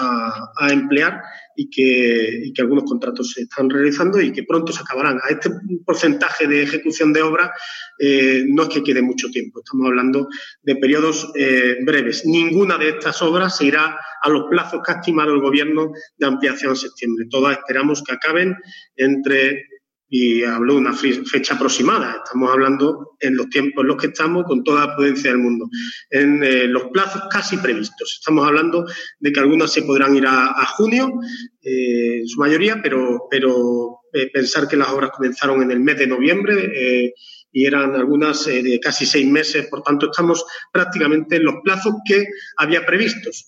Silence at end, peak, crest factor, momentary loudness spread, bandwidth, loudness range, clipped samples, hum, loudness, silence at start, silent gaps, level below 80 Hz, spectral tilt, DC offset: 0.05 s; -2 dBFS; 16 dB; 8 LU; 8 kHz; 2 LU; under 0.1%; none; -17 LUFS; 0 s; none; -74 dBFS; -4 dB/octave; under 0.1%